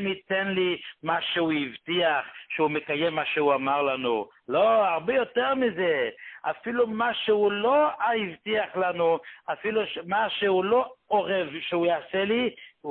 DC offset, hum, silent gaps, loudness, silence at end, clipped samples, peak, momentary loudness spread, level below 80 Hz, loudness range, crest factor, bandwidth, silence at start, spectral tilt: under 0.1%; none; none; -26 LUFS; 0 s; under 0.1%; -10 dBFS; 7 LU; -68 dBFS; 2 LU; 16 dB; 4.4 kHz; 0 s; -9 dB/octave